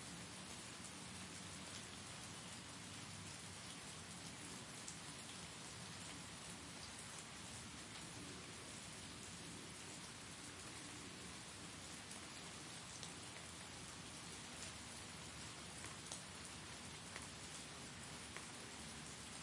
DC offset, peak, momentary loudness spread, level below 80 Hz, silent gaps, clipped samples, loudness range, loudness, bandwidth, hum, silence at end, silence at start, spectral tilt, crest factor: under 0.1%; -28 dBFS; 1 LU; -72 dBFS; none; under 0.1%; 1 LU; -52 LUFS; 11.5 kHz; none; 0 s; 0 s; -2.5 dB/octave; 24 dB